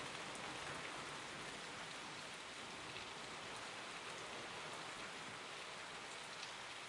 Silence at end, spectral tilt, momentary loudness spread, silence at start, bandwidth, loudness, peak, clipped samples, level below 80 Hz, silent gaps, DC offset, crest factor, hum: 0 s; -2 dB/octave; 2 LU; 0 s; 12 kHz; -48 LUFS; -34 dBFS; under 0.1%; -78 dBFS; none; under 0.1%; 16 dB; none